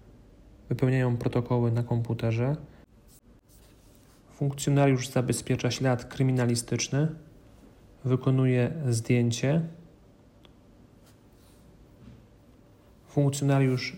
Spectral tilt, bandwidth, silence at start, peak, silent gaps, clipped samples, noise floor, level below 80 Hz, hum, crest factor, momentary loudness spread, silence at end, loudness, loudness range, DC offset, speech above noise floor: -6 dB/octave; 16 kHz; 0.65 s; -10 dBFS; none; under 0.1%; -56 dBFS; -56 dBFS; none; 18 dB; 7 LU; 0 s; -27 LUFS; 5 LU; under 0.1%; 30 dB